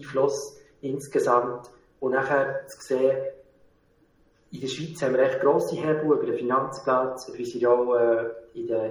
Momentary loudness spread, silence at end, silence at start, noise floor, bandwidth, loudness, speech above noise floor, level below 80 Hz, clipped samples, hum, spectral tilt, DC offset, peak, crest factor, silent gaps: 13 LU; 0 s; 0 s; -63 dBFS; 19.5 kHz; -25 LUFS; 38 dB; -66 dBFS; under 0.1%; none; -5.5 dB/octave; under 0.1%; -6 dBFS; 18 dB; none